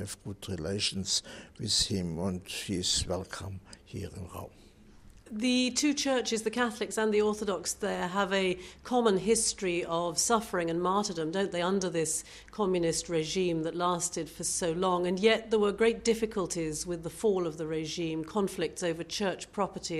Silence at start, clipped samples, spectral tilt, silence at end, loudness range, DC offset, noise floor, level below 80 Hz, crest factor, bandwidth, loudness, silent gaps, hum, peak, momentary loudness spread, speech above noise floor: 0 s; under 0.1%; -3.5 dB/octave; 0 s; 4 LU; under 0.1%; -54 dBFS; -56 dBFS; 18 dB; 14.5 kHz; -30 LUFS; none; none; -12 dBFS; 12 LU; 24 dB